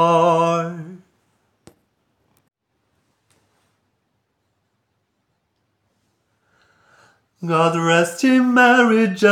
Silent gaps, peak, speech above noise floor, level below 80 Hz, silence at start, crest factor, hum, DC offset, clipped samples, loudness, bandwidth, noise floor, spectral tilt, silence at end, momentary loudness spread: none; -2 dBFS; 56 dB; -76 dBFS; 0 s; 18 dB; none; under 0.1%; under 0.1%; -16 LUFS; 15 kHz; -71 dBFS; -5.5 dB/octave; 0 s; 18 LU